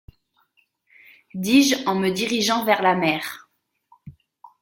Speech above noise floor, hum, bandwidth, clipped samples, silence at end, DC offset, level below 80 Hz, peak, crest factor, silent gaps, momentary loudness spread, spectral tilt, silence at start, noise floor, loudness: 46 dB; none; 16.5 kHz; under 0.1%; 0.15 s; under 0.1%; -60 dBFS; -4 dBFS; 20 dB; none; 15 LU; -3.5 dB/octave; 1.35 s; -66 dBFS; -20 LUFS